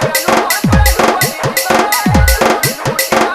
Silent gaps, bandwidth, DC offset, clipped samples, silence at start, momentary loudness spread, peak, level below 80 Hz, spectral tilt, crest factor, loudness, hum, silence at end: none; 16.5 kHz; under 0.1%; under 0.1%; 0 s; 4 LU; 0 dBFS; -20 dBFS; -4 dB/octave; 12 dB; -11 LUFS; none; 0 s